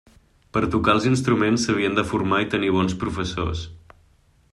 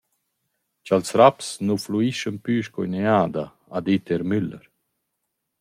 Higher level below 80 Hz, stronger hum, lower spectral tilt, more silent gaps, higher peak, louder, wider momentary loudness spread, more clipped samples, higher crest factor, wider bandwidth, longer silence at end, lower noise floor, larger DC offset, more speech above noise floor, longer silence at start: first, -44 dBFS vs -64 dBFS; neither; about the same, -5.5 dB/octave vs -6 dB/octave; neither; about the same, -4 dBFS vs -2 dBFS; about the same, -22 LUFS vs -22 LUFS; second, 8 LU vs 12 LU; neither; about the same, 18 dB vs 22 dB; second, 12 kHz vs 15.5 kHz; second, 0.75 s vs 1.05 s; second, -58 dBFS vs -78 dBFS; neither; second, 37 dB vs 57 dB; second, 0.55 s vs 0.85 s